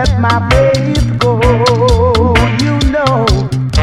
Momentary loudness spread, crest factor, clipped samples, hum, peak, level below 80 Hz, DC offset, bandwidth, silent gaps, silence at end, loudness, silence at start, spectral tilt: 3 LU; 10 dB; under 0.1%; none; 0 dBFS; -18 dBFS; under 0.1%; 13.5 kHz; none; 0 s; -11 LUFS; 0 s; -6 dB/octave